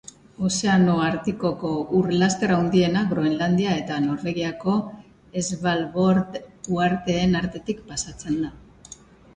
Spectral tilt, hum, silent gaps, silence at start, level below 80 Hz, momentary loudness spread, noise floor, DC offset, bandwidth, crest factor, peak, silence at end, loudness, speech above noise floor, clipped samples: -5.5 dB/octave; none; none; 0.4 s; -50 dBFS; 10 LU; -47 dBFS; under 0.1%; 9.8 kHz; 18 dB; -6 dBFS; 0.4 s; -23 LUFS; 24 dB; under 0.1%